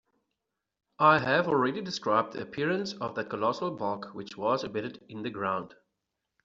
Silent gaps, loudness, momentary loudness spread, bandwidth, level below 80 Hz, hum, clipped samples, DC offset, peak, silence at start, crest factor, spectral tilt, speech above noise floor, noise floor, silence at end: none; -29 LUFS; 14 LU; 7.8 kHz; -70 dBFS; none; under 0.1%; under 0.1%; -8 dBFS; 1 s; 22 dB; -3.5 dB/octave; 56 dB; -85 dBFS; 0.75 s